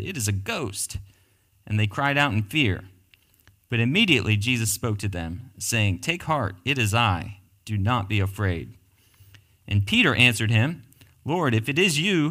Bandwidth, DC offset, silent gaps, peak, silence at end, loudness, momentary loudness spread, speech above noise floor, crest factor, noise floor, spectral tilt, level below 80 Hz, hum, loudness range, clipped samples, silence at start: 16 kHz; under 0.1%; none; -2 dBFS; 0 s; -23 LUFS; 13 LU; 39 dB; 22 dB; -62 dBFS; -4.5 dB/octave; -50 dBFS; none; 4 LU; under 0.1%; 0 s